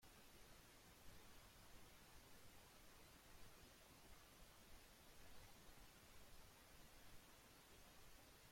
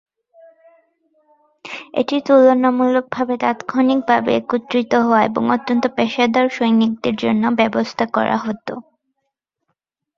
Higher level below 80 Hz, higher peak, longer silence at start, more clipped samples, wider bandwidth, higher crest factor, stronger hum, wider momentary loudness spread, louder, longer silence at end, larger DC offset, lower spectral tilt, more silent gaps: second, -72 dBFS vs -60 dBFS; second, -50 dBFS vs -2 dBFS; second, 0 s vs 1.65 s; neither; first, 16.5 kHz vs 7.2 kHz; about the same, 16 dB vs 16 dB; neither; second, 1 LU vs 8 LU; second, -66 LUFS vs -17 LUFS; second, 0 s vs 1.35 s; neither; second, -3 dB/octave vs -6 dB/octave; neither